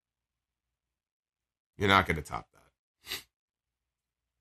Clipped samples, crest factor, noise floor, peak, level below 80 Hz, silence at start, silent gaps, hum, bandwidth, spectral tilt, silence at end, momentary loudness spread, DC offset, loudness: under 0.1%; 28 dB; under -90 dBFS; -8 dBFS; -56 dBFS; 1.8 s; 2.79-2.95 s; none; 13 kHz; -4.5 dB/octave; 1.2 s; 16 LU; under 0.1%; -29 LUFS